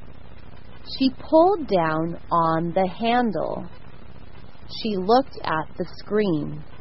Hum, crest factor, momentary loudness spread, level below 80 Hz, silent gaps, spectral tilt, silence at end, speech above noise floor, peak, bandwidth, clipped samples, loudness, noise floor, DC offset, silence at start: none; 20 dB; 15 LU; -48 dBFS; none; -10 dB/octave; 0.05 s; 22 dB; -4 dBFS; 5.8 kHz; under 0.1%; -23 LUFS; -45 dBFS; 2%; 0.3 s